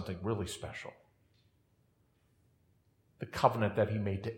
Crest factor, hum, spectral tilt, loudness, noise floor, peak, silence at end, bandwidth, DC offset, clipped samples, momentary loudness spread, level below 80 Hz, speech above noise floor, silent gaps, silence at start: 26 dB; none; -6 dB/octave; -34 LUFS; -72 dBFS; -12 dBFS; 0 s; 16 kHz; under 0.1%; under 0.1%; 17 LU; -66 dBFS; 38 dB; none; 0 s